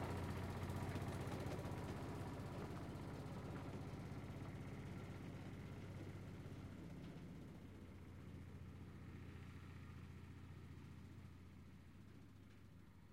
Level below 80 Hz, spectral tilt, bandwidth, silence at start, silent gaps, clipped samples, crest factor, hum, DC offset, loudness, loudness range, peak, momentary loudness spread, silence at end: -64 dBFS; -7 dB/octave; 16 kHz; 0 s; none; under 0.1%; 18 dB; none; under 0.1%; -53 LUFS; 9 LU; -34 dBFS; 14 LU; 0 s